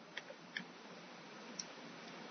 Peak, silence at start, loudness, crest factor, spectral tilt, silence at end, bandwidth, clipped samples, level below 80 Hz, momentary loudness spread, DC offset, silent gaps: -24 dBFS; 0 s; -50 LUFS; 28 dB; -1.5 dB/octave; 0 s; 6.4 kHz; under 0.1%; under -90 dBFS; 6 LU; under 0.1%; none